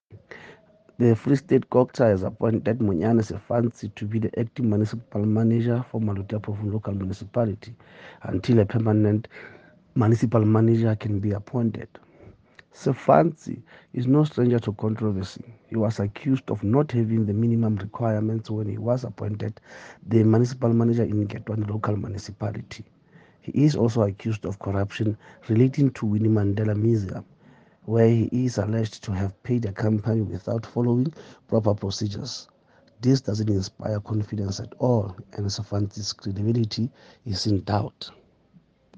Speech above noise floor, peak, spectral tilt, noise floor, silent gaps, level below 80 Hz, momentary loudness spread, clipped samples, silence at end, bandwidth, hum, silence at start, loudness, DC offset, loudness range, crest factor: 35 dB; -2 dBFS; -8 dB/octave; -58 dBFS; none; -62 dBFS; 14 LU; under 0.1%; 0.9 s; 7.8 kHz; none; 0.1 s; -24 LUFS; under 0.1%; 4 LU; 22 dB